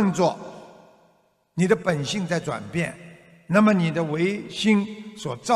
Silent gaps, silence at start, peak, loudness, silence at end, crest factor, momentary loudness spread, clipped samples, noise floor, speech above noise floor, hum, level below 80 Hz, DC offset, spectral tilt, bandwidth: none; 0 s; -6 dBFS; -23 LUFS; 0 s; 18 dB; 15 LU; under 0.1%; -63 dBFS; 41 dB; none; -62 dBFS; under 0.1%; -6 dB/octave; 12 kHz